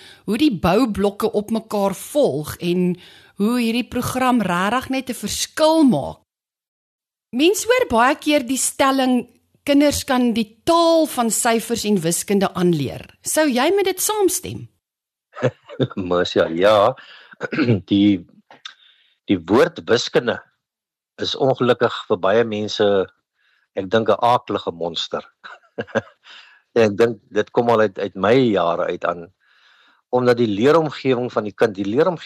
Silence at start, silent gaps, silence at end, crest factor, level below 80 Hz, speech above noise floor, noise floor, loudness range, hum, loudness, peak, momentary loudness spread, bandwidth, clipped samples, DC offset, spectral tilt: 0.25 s; 6.68-6.99 s; 0 s; 16 dB; -52 dBFS; 69 dB; -88 dBFS; 3 LU; none; -19 LUFS; -4 dBFS; 10 LU; 13 kHz; under 0.1%; under 0.1%; -4.5 dB/octave